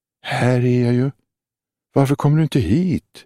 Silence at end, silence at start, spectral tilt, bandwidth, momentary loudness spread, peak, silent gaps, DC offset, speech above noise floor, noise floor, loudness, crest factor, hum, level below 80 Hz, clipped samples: 0.05 s; 0.25 s; -7.5 dB/octave; 13.5 kHz; 6 LU; -2 dBFS; none; under 0.1%; 72 dB; -88 dBFS; -18 LUFS; 16 dB; none; -46 dBFS; under 0.1%